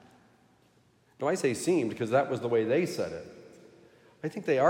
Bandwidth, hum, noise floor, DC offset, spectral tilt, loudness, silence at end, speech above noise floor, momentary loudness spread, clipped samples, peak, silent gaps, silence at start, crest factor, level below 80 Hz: 16 kHz; none; -65 dBFS; under 0.1%; -5.5 dB/octave; -29 LUFS; 0 s; 37 dB; 12 LU; under 0.1%; -12 dBFS; none; 1.2 s; 18 dB; -74 dBFS